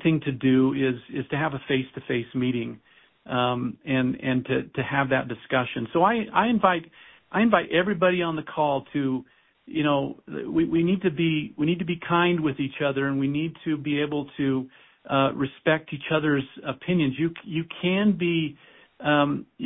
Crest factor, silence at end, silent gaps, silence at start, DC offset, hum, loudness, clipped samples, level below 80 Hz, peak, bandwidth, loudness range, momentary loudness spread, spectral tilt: 22 dB; 0 s; none; 0 s; under 0.1%; none; -25 LUFS; under 0.1%; -58 dBFS; -2 dBFS; 3.9 kHz; 3 LU; 8 LU; -11 dB/octave